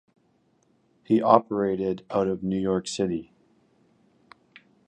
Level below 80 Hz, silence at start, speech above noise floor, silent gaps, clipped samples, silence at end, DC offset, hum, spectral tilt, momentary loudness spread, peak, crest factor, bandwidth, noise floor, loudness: -60 dBFS; 1.1 s; 42 dB; none; under 0.1%; 1.65 s; under 0.1%; none; -6.5 dB/octave; 9 LU; -2 dBFS; 26 dB; 10 kHz; -66 dBFS; -25 LUFS